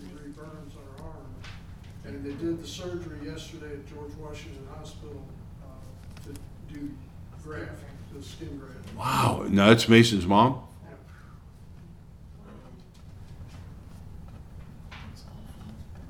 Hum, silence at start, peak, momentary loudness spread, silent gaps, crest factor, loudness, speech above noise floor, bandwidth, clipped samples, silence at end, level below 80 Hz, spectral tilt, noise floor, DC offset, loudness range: none; 0 s; -4 dBFS; 27 LU; none; 26 dB; -24 LUFS; 21 dB; 17 kHz; under 0.1%; 0 s; -48 dBFS; -5.5 dB/octave; -47 dBFS; under 0.1%; 24 LU